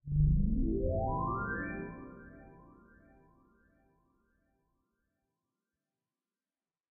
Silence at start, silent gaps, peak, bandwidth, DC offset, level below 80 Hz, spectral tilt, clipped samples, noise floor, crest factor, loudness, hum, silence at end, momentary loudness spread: 0.05 s; none; -18 dBFS; 2.5 kHz; under 0.1%; -40 dBFS; -6 dB/octave; under 0.1%; under -90 dBFS; 20 dB; -34 LUFS; none; 4.4 s; 22 LU